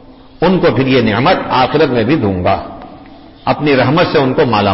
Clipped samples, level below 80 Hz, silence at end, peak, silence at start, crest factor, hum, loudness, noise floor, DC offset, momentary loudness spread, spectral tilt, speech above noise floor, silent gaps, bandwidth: under 0.1%; -38 dBFS; 0 s; -2 dBFS; 0.1 s; 10 dB; none; -12 LUFS; -36 dBFS; under 0.1%; 7 LU; -10 dB/octave; 25 dB; none; 5.8 kHz